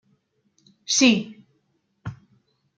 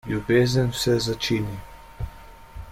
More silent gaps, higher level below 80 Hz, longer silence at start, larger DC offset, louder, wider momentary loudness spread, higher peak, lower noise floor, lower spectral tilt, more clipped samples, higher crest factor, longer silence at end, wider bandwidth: neither; second, -64 dBFS vs -42 dBFS; first, 0.9 s vs 0.05 s; neither; first, -19 LUFS vs -23 LUFS; first, 23 LU vs 19 LU; about the same, -4 dBFS vs -6 dBFS; first, -70 dBFS vs -43 dBFS; second, -2.5 dB/octave vs -5.5 dB/octave; neither; about the same, 22 dB vs 18 dB; first, 0.65 s vs 0 s; second, 9.4 kHz vs 16.5 kHz